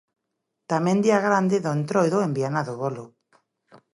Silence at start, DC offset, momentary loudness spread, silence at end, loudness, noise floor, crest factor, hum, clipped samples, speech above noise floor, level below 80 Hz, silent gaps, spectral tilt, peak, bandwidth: 0.7 s; under 0.1%; 10 LU; 0.9 s; -23 LUFS; -80 dBFS; 18 dB; none; under 0.1%; 58 dB; -72 dBFS; none; -6.5 dB/octave; -6 dBFS; 11.5 kHz